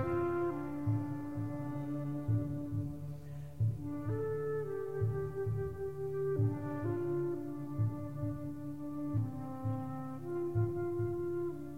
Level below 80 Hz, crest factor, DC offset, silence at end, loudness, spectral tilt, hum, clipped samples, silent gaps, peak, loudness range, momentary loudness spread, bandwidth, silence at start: -58 dBFS; 14 dB; 0.3%; 0 s; -38 LUFS; -10 dB/octave; none; under 0.1%; none; -22 dBFS; 2 LU; 6 LU; 3.9 kHz; 0 s